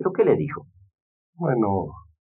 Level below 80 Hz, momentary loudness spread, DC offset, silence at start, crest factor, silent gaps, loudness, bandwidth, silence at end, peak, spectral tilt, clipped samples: -58 dBFS; 14 LU; under 0.1%; 0 s; 18 dB; 1.01-1.33 s; -23 LUFS; 3.6 kHz; 0.3 s; -6 dBFS; -12 dB/octave; under 0.1%